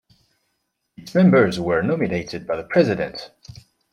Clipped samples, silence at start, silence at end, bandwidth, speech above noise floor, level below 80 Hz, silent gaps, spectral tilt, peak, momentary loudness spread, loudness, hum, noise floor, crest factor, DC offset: under 0.1%; 1 s; 0.65 s; 10 kHz; 54 dB; -54 dBFS; none; -7.5 dB/octave; -2 dBFS; 13 LU; -20 LUFS; none; -74 dBFS; 18 dB; under 0.1%